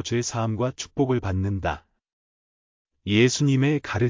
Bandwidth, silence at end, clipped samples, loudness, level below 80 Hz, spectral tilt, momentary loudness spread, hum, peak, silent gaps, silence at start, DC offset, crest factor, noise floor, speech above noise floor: 7.6 kHz; 0 s; under 0.1%; -24 LUFS; -44 dBFS; -5.5 dB/octave; 9 LU; none; -8 dBFS; 2.13-2.85 s; 0 s; under 0.1%; 18 dB; under -90 dBFS; over 67 dB